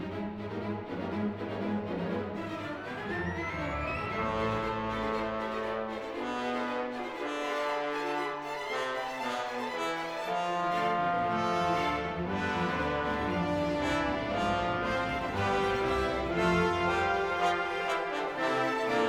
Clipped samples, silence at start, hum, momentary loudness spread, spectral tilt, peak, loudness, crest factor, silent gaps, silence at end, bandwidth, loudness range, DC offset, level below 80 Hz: under 0.1%; 0 s; none; 7 LU; -5.5 dB/octave; -16 dBFS; -32 LUFS; 16 dB; none; 0 s; 18 kHz; 5 LU; under 0.1%; -50 dBFS